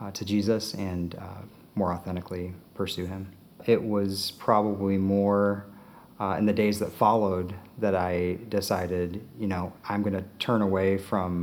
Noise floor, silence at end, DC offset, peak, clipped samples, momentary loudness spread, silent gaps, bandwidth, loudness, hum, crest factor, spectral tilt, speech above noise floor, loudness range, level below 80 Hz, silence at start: -50 dBFS; 0 s; under 0.1%; -8 dBFS; under 0.1%; 12 LU; none; 19.5 kHz; -28 LUFS; none; 20 dB; -6.5 dB/octave; 23 dB; 5 LU; -64 dBFS; 0 s